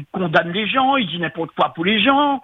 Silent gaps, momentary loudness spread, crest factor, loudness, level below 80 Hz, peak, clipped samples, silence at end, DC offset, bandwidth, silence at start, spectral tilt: none; 8 LU; 18 dB; -18 LUFS; -58 dBFS; 0 dBFS; under 0.1%; 0.05 s; under 0.1%; 6.2 kHz; 0 s; -7 dB/octave